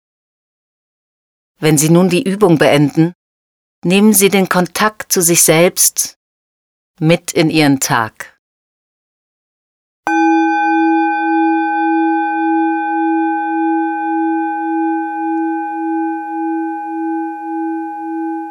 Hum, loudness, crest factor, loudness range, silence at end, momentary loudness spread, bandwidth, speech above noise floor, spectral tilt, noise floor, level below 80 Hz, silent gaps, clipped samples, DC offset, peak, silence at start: none; -14 LUFS; 14 dB; 6 LU; 0 s; 12 LU; over 20 kHz; over 78 dB; -4 dB/octave; under -90 dBFS; -58 dBFS; 3.15-3.82 s, 6.16-6.94 s, 8.39-10.03 s; under 0.1%; under 0.1%; 0 dBFS; 1.6 s